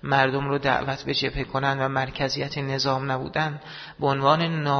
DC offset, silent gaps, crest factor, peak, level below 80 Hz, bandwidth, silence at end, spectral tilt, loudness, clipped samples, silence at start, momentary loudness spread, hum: under 0.1%; none; 20 dB; -4 dBFS; -48 dBFS; 6.6 kHz; 0 s; -5.5 dB/octave; -24 LUFS; under 0.1%; 0.05 s; 7 LU; none